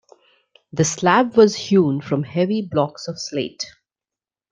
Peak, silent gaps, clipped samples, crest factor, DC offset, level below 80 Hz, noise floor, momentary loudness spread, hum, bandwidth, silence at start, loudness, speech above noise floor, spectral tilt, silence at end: -2 dBFS; none; under 0.1%; 18 dB; under 0.1%; -60 dBFS; -90 dBFS; 14 LU; none; 9.6 kHz; 0.75 s; -19 LUFS; 71 dB; -5 dB/octave; 0.8 s